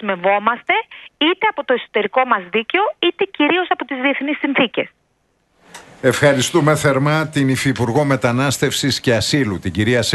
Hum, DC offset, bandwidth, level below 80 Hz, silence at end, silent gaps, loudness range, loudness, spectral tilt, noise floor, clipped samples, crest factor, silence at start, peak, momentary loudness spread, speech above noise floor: none; under 0.1%; 12.5 kHz; -50 dBFS; 0 s; none; 3 LU; -17 LUFS; -4.5 dB/octave; -64 dBFS; under 0.1%; 16 dB; 0 s; 0 dBFS; 5 LU; 47 dB